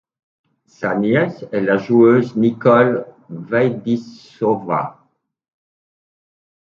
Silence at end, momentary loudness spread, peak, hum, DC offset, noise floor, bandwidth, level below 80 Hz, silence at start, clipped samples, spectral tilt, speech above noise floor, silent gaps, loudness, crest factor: 1.75 s; 12 LU; 0 dBFS; none; under 0.1%; -62 dBFS; 7 kHz; -64 dBFS; 0.8 s; under 0.1%; -8.5 dB/octave; 46 dB; none; -17 LUFS; 18 dB